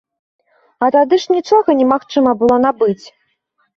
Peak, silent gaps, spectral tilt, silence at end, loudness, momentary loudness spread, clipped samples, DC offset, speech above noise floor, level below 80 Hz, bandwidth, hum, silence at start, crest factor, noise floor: -2 dBFS; none; -5.5 dB/octave; 0.8 s; -14 LUFS; 6 LU; under 0.1%; under 0.1%; 52 dB; -54 dBFS; 7.2 kHz; none; 0.8 s; 14 dB; -64 dBFS